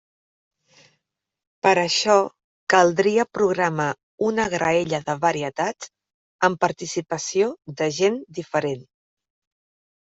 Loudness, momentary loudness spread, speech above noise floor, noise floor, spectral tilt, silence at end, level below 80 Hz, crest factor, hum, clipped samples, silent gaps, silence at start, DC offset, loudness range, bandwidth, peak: -22 LUFS; 11 LU; 54 dB; -75 dBFS; -4 dB/octave; 1.25 s; -64 dBFS; 20 dB; none; under 0.1%; 2.44-2.67 s, 4.03-4.18 s, 6.14-6.39 s; 1.65 s; under 0.1%; 4 LU; 8.2 kHz; -2 dBFS